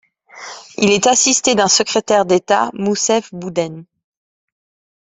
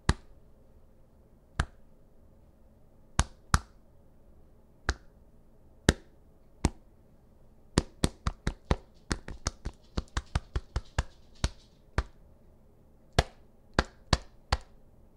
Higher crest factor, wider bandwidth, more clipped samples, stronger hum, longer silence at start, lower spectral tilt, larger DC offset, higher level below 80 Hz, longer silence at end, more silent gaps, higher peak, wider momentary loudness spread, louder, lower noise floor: second, 16 dB vs 34 dB; second, 8.4 kHz vs 13.5 kHz; neither; neither; first, 0.35 s vs 0.05 s; second, -2.5 dB/octave vs -4.5 dB/octave; neither; second, -58 dBFS vs -40 dBFS; first, 1.15 s vs 0.55 s; neither; about the same, 0 dBFS vs 0 dBFS; first, 17 LU vs 9 LU; first, -14 LUFS vs -34 LUFS; second, -36 dBFS vs -58 dBFS